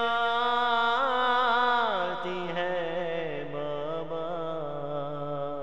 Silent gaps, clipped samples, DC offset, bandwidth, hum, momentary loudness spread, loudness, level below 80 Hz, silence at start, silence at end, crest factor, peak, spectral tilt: none; under 0.1%; 0.9%; 8.6 kHz; none; 10 LU; -28 LUFS; -60 dBFS; 0 s; 0 s; 16 dB; -14 dBFS; -5.5 dB/octave